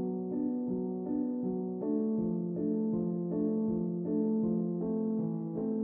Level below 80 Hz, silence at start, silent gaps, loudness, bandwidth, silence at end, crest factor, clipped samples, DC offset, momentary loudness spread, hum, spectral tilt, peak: -66 dBFS; 0 s; none; -33 LUFS; 1.9 kHz; 0 s; 12 dB; under 0.1%; under 0.1%; 4 LU; none; -12.5 dB/octave; -20 dBFS